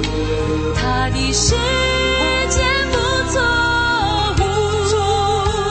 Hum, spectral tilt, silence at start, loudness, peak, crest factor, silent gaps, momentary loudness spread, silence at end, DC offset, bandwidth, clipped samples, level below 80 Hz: none; -3.5 dB/octave; 0 s; -17 LUFS; -2 dBFS; 14 dB; none; 4 LU; 0 s; under 0.1%; 8.8 kHz; under 0.1%; -26 dBFS